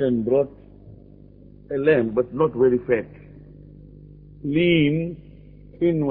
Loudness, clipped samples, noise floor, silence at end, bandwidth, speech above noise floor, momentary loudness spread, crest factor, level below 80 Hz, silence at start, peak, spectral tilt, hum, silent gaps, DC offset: -21 LUFS; under 0.1%; -46 dBFS; 0 s; 4.2 kHz; 26 dB; 13 LU; 18 dB; -50 dBFS; 0 s; -6 dBFS; -11 dB/octave; 50 Hz at -45 dBFS; none; under 0.1%